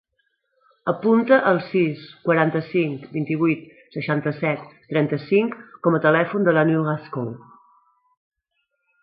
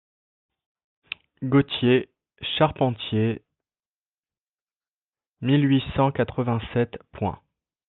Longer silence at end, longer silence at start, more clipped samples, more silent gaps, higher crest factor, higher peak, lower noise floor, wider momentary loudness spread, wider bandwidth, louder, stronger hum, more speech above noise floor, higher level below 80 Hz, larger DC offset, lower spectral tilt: first, 1.65 s vs 0.55 s; second, 0.85 s vs 1.4 s; neither; second, none vs 3.87-4.23 s, 4.39-4.66 s, 4.90-5.12 s, 5.27-5.33 s; about the same, 20 dB vs 20 dB; about the same, -2 dBFS vs -4 dBFS; second, -75 dBFS vs under -90 dBFS; about the same, 13 LU vs 15 LU; first, 5.2 kHz vs 4.2 kHz; first, -21 LUFS vs -24 LUFS; neither; second, 54 dB vs over 67 dB; second, -68 dBFS vs -52 dBFS; neither; first, -12 dB/octave vs -10.5 dB/octave